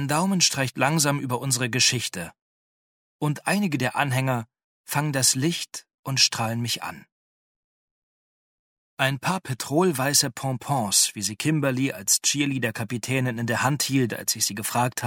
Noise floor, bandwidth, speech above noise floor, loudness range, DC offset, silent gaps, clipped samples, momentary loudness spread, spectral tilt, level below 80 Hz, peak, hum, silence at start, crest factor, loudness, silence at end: under -90 dBFS; 17.5 kHz; over 66 dB; 5 LU; under 0.1%; 2.42-3.19 s, 4.64-4.84 s, 5.94-6.03 s, 7.12-8.97 s; under 0.1%; 9 LU; -3 dB/octave; -64 dBFS; -6 dBFS; none; 0 s; 20 dB; -23 LUFS; 0 s